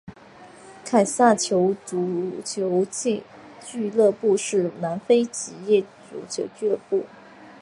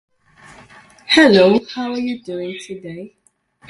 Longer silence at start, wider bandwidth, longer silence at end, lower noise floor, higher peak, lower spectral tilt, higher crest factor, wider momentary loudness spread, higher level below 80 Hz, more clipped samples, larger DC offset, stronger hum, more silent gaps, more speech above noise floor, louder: second, 0.05 s vs 1.1 s; about the same, 11.5 kHz vs 11.5 kHz; second, 0.05 s vs 0.65 s; second, -47 dBFS vs -53 dBFS; second, -4 dBFS vs 0 dBFS; about the same, -4.5 dB/octave vs -5 dB/octave; about the same, 20 dB vs 18 dB; second, 13 LU vs 21 LU; second, -68 dBFS vs -58 dBFS; neither; neither; neither; neither; second, 24 dB vs 37 dB; second, -23 LUFS vs -15 LUFS